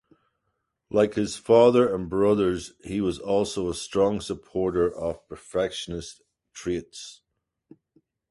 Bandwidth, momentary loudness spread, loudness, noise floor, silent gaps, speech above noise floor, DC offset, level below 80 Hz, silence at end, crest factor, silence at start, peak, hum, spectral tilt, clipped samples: 11.5 kHz; 17 LU; -25 LUFS; -78 dBFS; none; 54 dB; under 0.1%; -52 dBFS; 1.15 s; 20 dB; 0.9 s; -6 dBFS; none; -5.5 dB/octave; under 0.1%